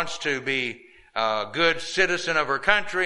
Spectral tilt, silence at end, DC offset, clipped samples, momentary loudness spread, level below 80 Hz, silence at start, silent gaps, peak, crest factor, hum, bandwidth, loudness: -2.5 dB/octave; 0 s; under 0.1%; under 0.1%; 8 LU; -52 dBFS; 0 s; none; -2 dBFS; 22 dB; none; 11.5 kHz; -24 LUFS